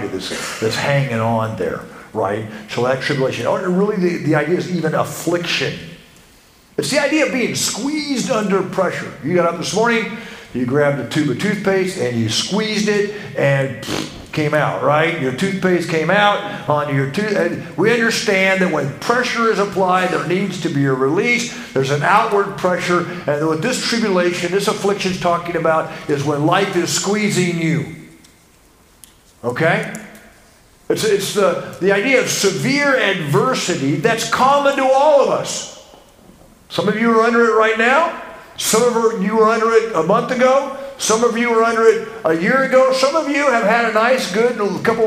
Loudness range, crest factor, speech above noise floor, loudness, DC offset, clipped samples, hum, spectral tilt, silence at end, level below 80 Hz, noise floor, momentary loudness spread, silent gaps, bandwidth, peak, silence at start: 5 LU; 16 dB; 33 dB; -17 LUFS; under 0.1%; under 0.1%; none; -4.5 dB/octave; 0 s; -54 dBFS; -50 dBFS; 8 LU; none; 16 kHz; 0 dBFS; 0 s